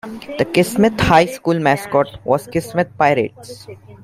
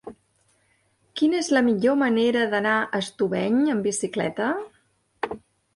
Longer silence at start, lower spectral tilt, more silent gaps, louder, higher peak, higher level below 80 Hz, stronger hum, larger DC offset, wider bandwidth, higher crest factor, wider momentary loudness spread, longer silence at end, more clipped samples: about the same, 0.05 s vs 0.05 s; about the same, -5.5 dB/octave vs -4.5 dB/octave; neither; first, -16 LUFS vs -23 LUFS; first, 0 dBFS vs -8 dBFS; first, -42 dBFS vs -66 dBFS; neither; neither; first, 16 kHz vs 11.5 kHz; about the same, 16 dB vs 16 dB; about the same, 14 LU vs 13 LU; second, 0.1 s vs 0.4 s; neither